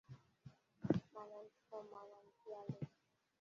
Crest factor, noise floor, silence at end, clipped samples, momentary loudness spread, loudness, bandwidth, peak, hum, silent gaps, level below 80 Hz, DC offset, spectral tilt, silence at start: 28 dB; -82 dBFS; 0.55 s; under 0.1%; 22 LU; -48 LUFS; 7.4 kHz; -20 dBFS; none; none; -76 dBFS; under 0.1%; -8.5 dB/octave; 0.1 s